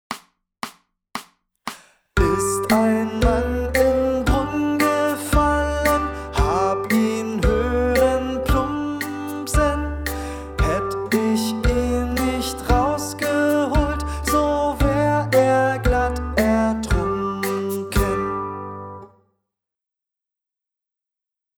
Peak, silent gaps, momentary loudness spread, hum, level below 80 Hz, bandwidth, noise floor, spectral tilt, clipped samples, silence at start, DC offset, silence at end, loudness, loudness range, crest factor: -4 dBFS; none; 13 LU; none; -28 dBFS; over 20 kHz; -87 dBFS; -5.5 dB/octave; under 0.1%; 0.1 s; under 0.1%; 2.55 s; -21 LUFS; 5 LU; 18 dB